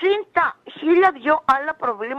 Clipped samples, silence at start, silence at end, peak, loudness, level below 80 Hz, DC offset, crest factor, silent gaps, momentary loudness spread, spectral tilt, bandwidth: under 0.1%; 0 s; 0 s; -4 dBFS; -19 LUFS; -60 dBFS; under 0.1%; 16 dB; none; 8 LU; -5 dB/octave; 6.6 kHz